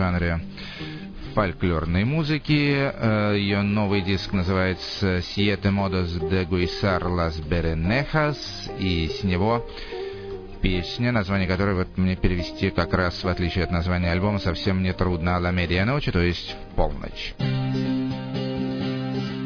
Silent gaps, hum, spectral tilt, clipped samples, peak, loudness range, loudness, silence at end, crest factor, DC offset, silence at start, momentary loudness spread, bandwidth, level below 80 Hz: none; none; -7 dB/octave; under 0.1%; -6 dBFS; 3 LU; -24 LUFS; 0 s; 18 dB; under 0.1%; 0 s; 8 LU; 5.4 kHz; -36 dBFS